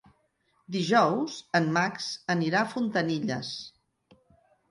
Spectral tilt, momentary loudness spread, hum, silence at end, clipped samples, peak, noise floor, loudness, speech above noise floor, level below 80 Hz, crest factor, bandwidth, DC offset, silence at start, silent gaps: -5 dB/octave; 12 LU; none; 1 s; under 0.1%; -8 dBFS; -71 dBFS; -27 LUFS; 44 dB; -72 dBFS; 20 dB; 11.5 kHz; under 0.1%; 0.7 s; none